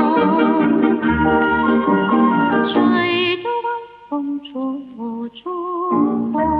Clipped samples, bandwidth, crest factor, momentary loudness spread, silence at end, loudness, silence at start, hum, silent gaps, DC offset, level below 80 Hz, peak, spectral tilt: under 0.1%; 4.9 kHz; 14 dB; 12 LU; 0 s; -17 LUFS; 0 s; 50 Hz at -60 dBFS; none; under 0.1%; -44 dBFS; -2 dBFS; -9 dB/octave